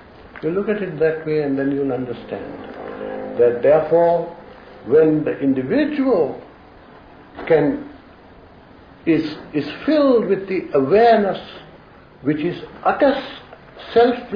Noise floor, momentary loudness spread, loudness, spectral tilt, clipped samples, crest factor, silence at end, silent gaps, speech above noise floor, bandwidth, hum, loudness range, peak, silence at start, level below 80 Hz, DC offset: -45 dBFS; 18 LU; -19 LUFS; -9 dB/octave; under 0.1%; 16 dB; 0 s; none; 27 dB; 5.2 kHz; none; 5 LU; -4 dBFS; 0.2 s; -52 dBFS; under 0.1%